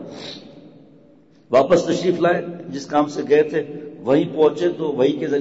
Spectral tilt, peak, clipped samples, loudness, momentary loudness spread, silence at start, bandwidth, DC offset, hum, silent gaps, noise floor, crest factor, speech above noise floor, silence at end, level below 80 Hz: -6 dB/octave; -4 dBFS; under 0.1%; -19 LUFS; 16 LU; 0 s; 8 kHz; 0.1%; none; none; -51 dBFS; 14 dB; 33 dB; 0 s; -58 dBFS